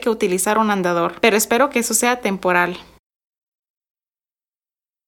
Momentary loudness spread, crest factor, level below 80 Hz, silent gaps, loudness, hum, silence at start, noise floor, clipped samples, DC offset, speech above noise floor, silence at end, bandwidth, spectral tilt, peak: 4 LU; 18 dB; -58 dBFS; none; -17 LUFS; none; 0 s; under -90 dBFS; under 0.1%; under 0.1%; over 72 dB; 2.25 s; 19 kHz; -3 dB/octave; -2 dBFS